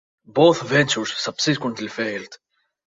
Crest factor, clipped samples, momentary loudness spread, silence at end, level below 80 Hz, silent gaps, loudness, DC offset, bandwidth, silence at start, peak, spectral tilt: 20 dB; under 0.1%; 11 LU; 0.55 s; -62 dBFS; none; -20 LUFS; under 0.1%; 7.8 kHz; 0.35 s; -2 dBFS; -4 dB/octave